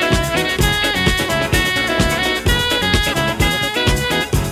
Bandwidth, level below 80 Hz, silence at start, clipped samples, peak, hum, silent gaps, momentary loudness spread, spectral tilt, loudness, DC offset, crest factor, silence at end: 16 kHz; -26 dBFS; 0 s; under 0.1%; 0 dBFS; none; none; 2 LU; -3.5 dB/octave; -16 LUFS; under 0.1%; 16 dB; 0 s